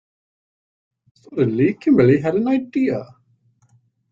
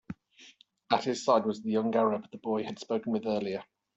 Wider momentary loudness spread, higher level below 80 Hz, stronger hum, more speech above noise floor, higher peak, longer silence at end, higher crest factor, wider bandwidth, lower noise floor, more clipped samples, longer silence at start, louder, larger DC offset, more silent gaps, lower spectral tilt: about the same, 9 LU vs 10 LU; first, -58 dBFS vs -72 dBFS; neither; first, 43 dB vs 29 dB; first, -2 dBFS vs -10 dBFS; first, 1.05 s vs 0.35 s; about the same, 18 dB vs 22 dB; second, 7.4 kHz vs 8.2 kHz; about the same, -60 dBFS vs -58 dBFS; neither; first, 1.3 s vs 0.1 s; first, -18 LUFS vs -30 LUFS; neither; neither; first, -9.5 dB/octave vs -5.5 dB/octave